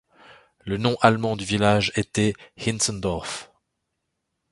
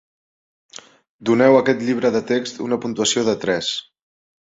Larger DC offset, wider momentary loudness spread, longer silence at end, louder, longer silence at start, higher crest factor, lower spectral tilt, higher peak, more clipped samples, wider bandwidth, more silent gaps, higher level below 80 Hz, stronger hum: neither; about the same, 12 LU vs 10 LU; first, 1.05 s vs 0.7 s; second, -23 LUFS vs -19 LUFS; second, 0.3 s vs 1.2 s; first, 24 dB vs 18 dB; about the same, -4.5 dB/octave vs -4 dB/octave; about the same, 0 dBFS vs -2 dBFS; neither; first, 11.5 kHz vs 7.8 kHz; neither; first, -48 dBFS vs -60 dBFS; neither